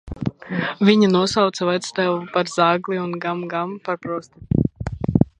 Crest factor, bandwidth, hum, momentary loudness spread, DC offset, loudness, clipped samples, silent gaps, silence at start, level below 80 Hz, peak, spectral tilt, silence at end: 20 dB; 10 kHz; none; 11 LU; under 0.1%; -21 LUFS; under 0.1%; none; 0.05 s; -42 dBFS; 0 dBFS; -6 dB/octave; 0.15 s